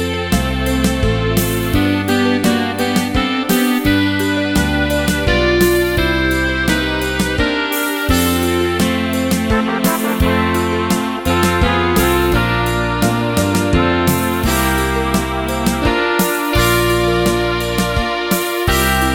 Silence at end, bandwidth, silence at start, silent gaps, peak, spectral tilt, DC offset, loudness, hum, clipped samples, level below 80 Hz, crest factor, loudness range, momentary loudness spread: 0 s; 17.5 kHz; 0 s; none; 0 dBFS; -4.5 dB/octave; under 0.1%; -15 LUFS; none; under 0.1%; -26 dBFS; 14 dB; 1 LU; 3 LU